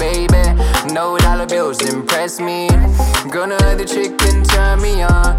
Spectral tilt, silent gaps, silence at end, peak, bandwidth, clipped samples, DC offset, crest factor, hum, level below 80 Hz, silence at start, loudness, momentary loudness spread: -4.5 dB/octave; none; 0 s; 0 dBFS; 16.5 kHz; under 0.1%; under 0.1%; 12 dB; none; -14 dBFS; 0 s; -15 LUFS; 4 LU